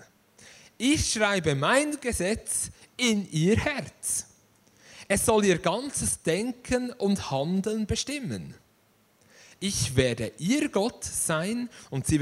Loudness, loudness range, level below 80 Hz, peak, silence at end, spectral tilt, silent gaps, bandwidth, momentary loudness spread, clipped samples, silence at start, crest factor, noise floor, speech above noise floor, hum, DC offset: -27 LUFS; 4 LU; -48 dBFS; -6 dBFS; 0 s; -4 dB/octave; none; 16 kHz; 8 LU; under 0.1%; 0 s; 20 dB; -64 dBFS; 38 dB; none; under 0.1%